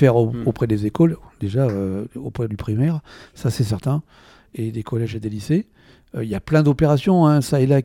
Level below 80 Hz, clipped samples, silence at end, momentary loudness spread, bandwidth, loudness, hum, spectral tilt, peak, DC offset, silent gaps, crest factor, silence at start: -46 dBFS; under 0.1%; 0 s; 13 LU; 16 kHz; -21 LUFS; none; -8 dB/octave; -2 dBFS; under 0.1%; none; 18 dB; 0 s